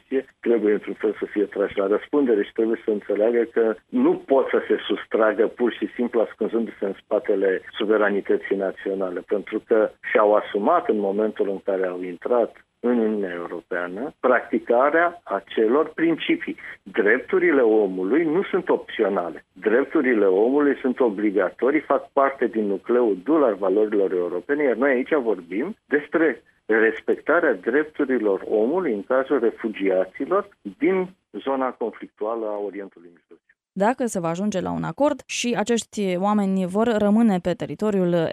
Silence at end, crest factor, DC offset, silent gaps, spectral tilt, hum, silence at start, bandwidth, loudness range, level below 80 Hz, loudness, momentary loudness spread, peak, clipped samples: 0 s; 18 dB; under 0.1%; none; -6 dB/octave; none; 0.1 s; 11.5 kHz; 4 LU; -64 dBFS; -22 LUFS; 8 LU; -4 dBFS; under 0.1%